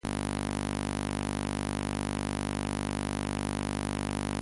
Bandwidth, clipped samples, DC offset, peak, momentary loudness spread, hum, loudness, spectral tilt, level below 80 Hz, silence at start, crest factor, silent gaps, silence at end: 11.5 kHz; under 0.1%; under 0.1%; -18 dBFS; 0 LU; none; -33 LUFS; -5 dB/octave; -42 dBFS; 0.05 s; 16 dB; none; 0 s